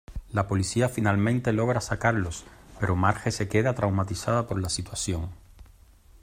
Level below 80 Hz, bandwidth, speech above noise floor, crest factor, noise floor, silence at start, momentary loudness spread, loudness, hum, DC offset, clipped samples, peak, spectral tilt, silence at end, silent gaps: -46 dBFS; 16 kHz; 28 dB; 20 dB; -54 dBFS; 0.1 s; 7 LU; -27 LUFS; none; under 0.1%; under 0.1%; -8 dBFS; -5.5 dB/octave; 0.6 s; none